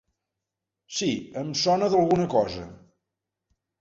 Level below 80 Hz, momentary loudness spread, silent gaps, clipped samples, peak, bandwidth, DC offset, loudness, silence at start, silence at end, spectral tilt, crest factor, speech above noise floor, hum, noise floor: -58 dBFS; 12 LU; none; under 0.1%; -8 dBFS; 8 kHz; under 0.1%; -25 LUFS; 0.9 s; 1.05 s; -5 dB/octave; 18 dB; 62 dB; none; -86 dBFS